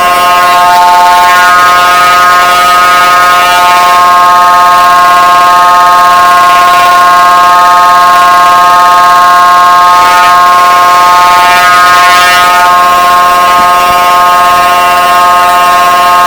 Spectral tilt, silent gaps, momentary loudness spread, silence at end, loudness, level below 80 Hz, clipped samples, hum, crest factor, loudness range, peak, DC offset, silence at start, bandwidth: -1 dB/octave; none; 2 LU; 0 s; -2 LUFS; -38 dBFS; 10%; none; 2 dB; 1 LU; 0 dBFS; 0.8%; 0 s; over 20 kHz